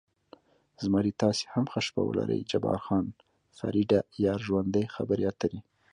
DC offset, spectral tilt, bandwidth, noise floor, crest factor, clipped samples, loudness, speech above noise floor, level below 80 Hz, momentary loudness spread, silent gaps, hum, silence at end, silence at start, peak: under 0.1%; -6.5 dB/octave; 10.5 kHz; -58 dBFS; 18 dB; under 0.1%; -29 LUFS; 29 dB; -56 dBFS; 8 LU; none; none; 0.3 s; 0.8 s; -12 dBFS